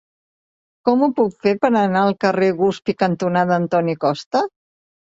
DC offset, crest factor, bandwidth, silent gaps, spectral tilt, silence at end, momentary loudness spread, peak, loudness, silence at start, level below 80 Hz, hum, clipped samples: under 0.1%; 16 dB; 7.8 kHz; 4.26-4.31 s; -7 dB/octave; 0.65 s; 5 LU; -2 dBFS; -18 LUFS; 0.85 s; -60 dBFS; none; under 0.1%